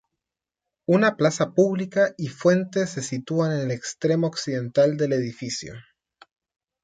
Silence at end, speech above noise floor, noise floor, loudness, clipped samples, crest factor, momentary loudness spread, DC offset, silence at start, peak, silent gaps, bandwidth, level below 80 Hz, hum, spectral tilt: 1 s; 65 dB; -88 dBFS; -23 LUFS; under 0.1%; 16 dB; 10 LU; under 0.1%; 0.9 s; -8 dBFS; none; 9.4 kHz; -66 dBFS; none; -5.5 dB/octave